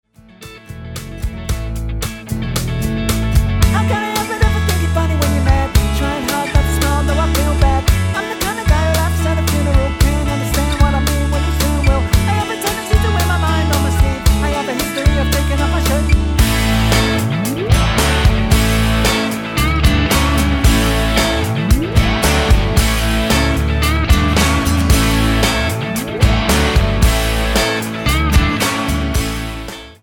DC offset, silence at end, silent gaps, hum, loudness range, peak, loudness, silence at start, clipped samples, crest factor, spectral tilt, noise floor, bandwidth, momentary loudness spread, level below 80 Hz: under 0.1%; 0.1 s; none; none; 2 LU; 0 dBFS; -15 LUFS; 0.4 s; under 0.1%; 14 dB; -5 dB/octave; -38 dBFS; 19 kHz; 6 LU; -18 dBFS